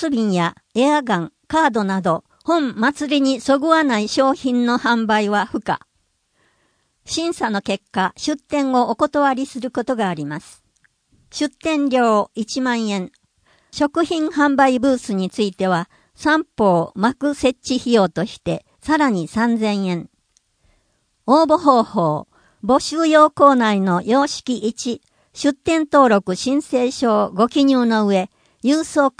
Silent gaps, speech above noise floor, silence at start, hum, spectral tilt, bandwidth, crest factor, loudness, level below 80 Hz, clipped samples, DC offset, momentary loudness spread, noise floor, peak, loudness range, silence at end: none; 50 dB; 0 s; none; -5 dB/octave; 10.5 kHz; 18 dB; -18 LUFS; -56 dBFS; under 0.1%; under 0.1%; 10 LU; -67 dBFS; 0 dBFS; 5 LU; 0.1 s